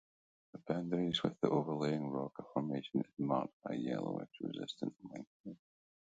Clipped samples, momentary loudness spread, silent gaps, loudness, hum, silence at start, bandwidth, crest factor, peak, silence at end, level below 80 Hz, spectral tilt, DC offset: under 0.1%; 17 LU; 3.53-3.60 s, 5.27-5.44 s; -39 LUFS; none; 0.55 s; 8.6 kHz; 24 dB; -16 dBFS; 0.6 s; -76 dBFS; -7 dB/octave; under 0.1%